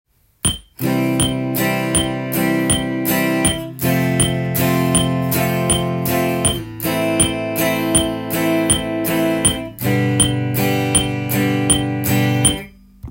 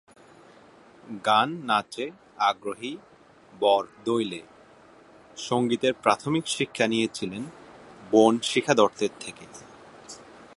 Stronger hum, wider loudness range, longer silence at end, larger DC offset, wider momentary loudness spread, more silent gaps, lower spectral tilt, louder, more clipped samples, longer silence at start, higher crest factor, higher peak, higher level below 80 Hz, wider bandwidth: neither; second, 1 LU vs 4 LU; about the same, 0 s vs 0.1 s; neither; second, 5 LU vs 22 LU; neither; about the same, -4 dB/octave vs -4 dB/octave; first, -17 LUFS vs -25 LUFS; neither; second, 0.45 s vs 1.05 s; second, 16 dB vs 22 dB; about the same, -2 dBFS vs -4 dBFS; first, -38 dBFS vs -68 dBFS; first, 17 kHz vs 11.5 kHz